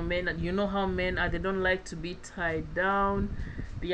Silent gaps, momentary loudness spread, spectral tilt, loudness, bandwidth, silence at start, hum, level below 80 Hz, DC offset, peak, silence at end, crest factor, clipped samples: none; 11 LU; -6 dB/octave; -30 LUFS; 9.8 kHz; 0 s; none; -40 dBFS; under 0.1%; -16 dBFS; 0 s; 14 dB; under 0.1%